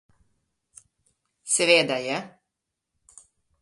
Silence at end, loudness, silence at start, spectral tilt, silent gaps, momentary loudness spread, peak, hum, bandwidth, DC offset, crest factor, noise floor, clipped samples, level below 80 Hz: 1.35 s; -22 LUFS; 1.45 s; -1.5 dB/octave; none; 24 LU; -4 dBFS; none; 11.5 kHz; under 0.1%; 24 dB; -83 dBFS; under 0.1%; -74 dBFS